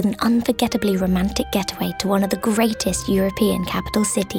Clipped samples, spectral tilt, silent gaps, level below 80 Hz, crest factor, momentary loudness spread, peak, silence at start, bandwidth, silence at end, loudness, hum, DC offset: under 0.1%; -5 dB/octave; none; -38 dBFS; 14 dB; 4 LU; -6 dBFS; 0 s; 18.5 kHz; 0 s; -20 LUFS; none; under 0.1%